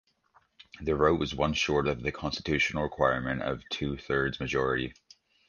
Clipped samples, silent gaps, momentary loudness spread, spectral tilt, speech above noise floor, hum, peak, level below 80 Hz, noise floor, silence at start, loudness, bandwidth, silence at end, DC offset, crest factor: under 0.1%; none; 7 LU; -5 dB/octave; 38 dB; none; -10 dBFS; -48 dBFS; -67 dBFS; 0.75 s; -29 LUFS; 7.2 kHz; 0.55 s; under 0.1%; 20 dB